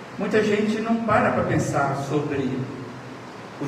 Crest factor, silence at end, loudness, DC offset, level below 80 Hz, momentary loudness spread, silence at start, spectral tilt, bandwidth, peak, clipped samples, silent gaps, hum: 16 dB; 0 s; -23 LUFS; under 0.1%; -56 dBFS; 17 LU; 0 s; -6.5 dB/octave; 14.5 kHz; -8 dBFS; under 0.1%; none; none